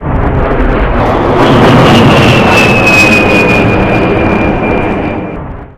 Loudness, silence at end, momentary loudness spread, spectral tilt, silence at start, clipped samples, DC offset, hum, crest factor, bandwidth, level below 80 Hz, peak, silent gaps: -6 LUFS; 0.1 s; 9 LU; -6 dB/octave; 0 s; 1%; under 0.1%; none; 6 dB; 16 kHz; -18 dBFS; 0 dBFS; none